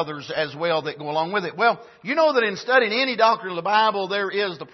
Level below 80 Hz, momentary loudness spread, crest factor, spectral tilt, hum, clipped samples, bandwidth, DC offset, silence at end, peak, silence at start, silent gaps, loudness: -72 dBFS; 8 LU; 18 dB; -4.5 dB/octave; none; under 0.1%; 6.2 kHz; under 0.1%; 0.05 s; -4 dBFS; 0 s; none; -22 LUFS